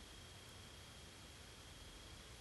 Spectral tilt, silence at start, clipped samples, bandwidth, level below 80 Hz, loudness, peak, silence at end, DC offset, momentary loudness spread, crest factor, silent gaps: -3 dB/octave; 0 s; under 0.1%; 12.5 kHz; -64 dBFS; -57 LUFS; -44 dBFS; 0 s; under 0.1%; 1 LU; 12 dB; none